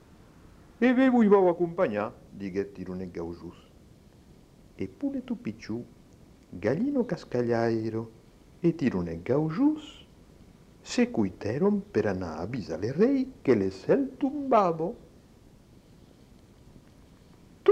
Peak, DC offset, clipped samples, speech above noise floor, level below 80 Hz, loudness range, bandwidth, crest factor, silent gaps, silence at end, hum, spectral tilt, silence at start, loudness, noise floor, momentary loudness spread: -10 dBFS; under 0.1%; under 0.1%; 28 dB; -58 dBFS; 11 LU; 9 kHz; 20 dB; none; 0 s; none; -7.5 dB/octave; 0.8 s; -28 LUFS; -55 dBFS; 15 LU